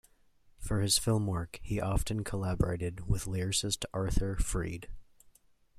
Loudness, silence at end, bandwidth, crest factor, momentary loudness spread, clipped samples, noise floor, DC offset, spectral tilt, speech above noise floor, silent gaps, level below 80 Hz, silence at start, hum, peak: -33 LUFS; 0.75 s; 15 kHz; 20 dB; 10 LU; under 0.1%; -63 dBFS; under 0.1%; -4.5 dB/octave; 32 dB; none; -40 dBFS; 0.6 s; none; -12 dBFS